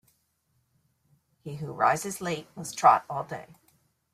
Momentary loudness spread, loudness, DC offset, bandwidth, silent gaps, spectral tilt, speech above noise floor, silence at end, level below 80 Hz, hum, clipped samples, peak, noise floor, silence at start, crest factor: 19 LU; -26 LUFS; under 0.1%; 15.5 kHz; none; -4 dB/octave; 46 dB; 0.7 s; -70 dBFS; none; under 0.1%; -6 dBFS; -73 dBFS; 1.45 s; 24 dB